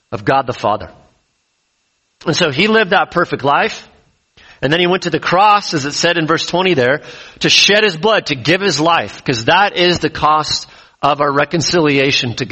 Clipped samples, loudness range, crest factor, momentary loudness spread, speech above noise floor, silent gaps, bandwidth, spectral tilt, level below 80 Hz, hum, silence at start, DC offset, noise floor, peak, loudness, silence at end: under 0.1%; 4 LU; 14 dB; 8 LU; 50 dB; none; 8.4 kHz; -3.5 dB/octave; -48 dBFS; none; 0.1 s; under 0.1%; -64 dBFS; 0 dBFS; -13 LUFS; 0 s